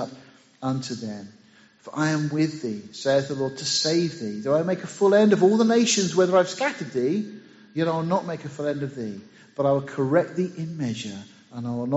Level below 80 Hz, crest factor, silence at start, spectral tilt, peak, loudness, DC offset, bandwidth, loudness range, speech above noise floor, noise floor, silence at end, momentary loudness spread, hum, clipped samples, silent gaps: -68 dBFS; 18 dB; 0 s; -5 dB/octave; -6 dBFS; -24 LUFS; under 0.1%; 8 kHz; 7 LU; 25 dB; -49 dBFS; 0 s; 17 LU; none; under 0.1%; none